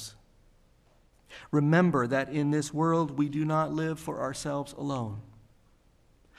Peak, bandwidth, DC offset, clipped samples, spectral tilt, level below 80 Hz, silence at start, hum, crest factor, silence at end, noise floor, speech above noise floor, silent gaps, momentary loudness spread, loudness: -12 dBFS; 13.5 kHz; under 0.1%; under 0.1%; -6.5 dB/octave; -62 dBFS; 0 s; none; 20 dB; 1.1 s; -63 dBFS; 35 dB; none; 14 LU; -29 LUFS